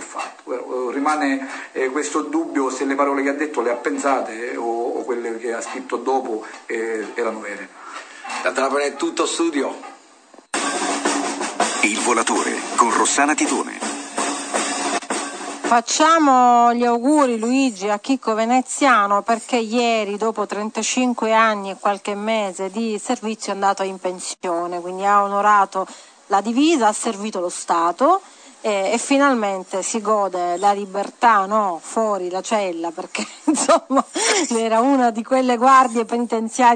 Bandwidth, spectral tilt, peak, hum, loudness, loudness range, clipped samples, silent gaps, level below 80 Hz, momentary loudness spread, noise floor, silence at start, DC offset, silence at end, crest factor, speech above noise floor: 9.4 kHz; -2.5 dB/octave; -2 dBFS; none; -19 LUFS; 7 LU; under 0.1%; none; -74 dBFS; 11 LU; -48 dBFS; 0 s; under 0.1%; 0 s; 18 dB; 29 dB